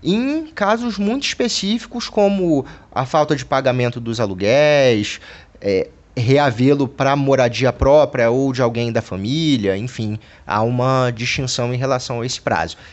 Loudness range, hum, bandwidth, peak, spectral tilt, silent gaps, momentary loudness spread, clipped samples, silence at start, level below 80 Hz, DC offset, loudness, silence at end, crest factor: 3 LU; none; 8.4 kHz; -2 dBFS; -5.5 dB/octave; none; 9 LU; under 0.1%; 0 s; -42 dBFS; under 0.1%; -18 LUFS; 0.05 s; 14 dB